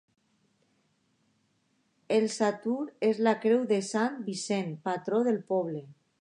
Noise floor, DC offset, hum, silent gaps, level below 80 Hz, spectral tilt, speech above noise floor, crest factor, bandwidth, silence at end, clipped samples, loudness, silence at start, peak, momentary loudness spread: -73 dBFS; under 0.1%; none; none; -84 dBFS; -5 dB/octave; 44 dB; 18 dB; 11 kHz; 0.3 s; under 0.1%; -29 LUFS; 2.1 s; -12 dBFS; 7 LU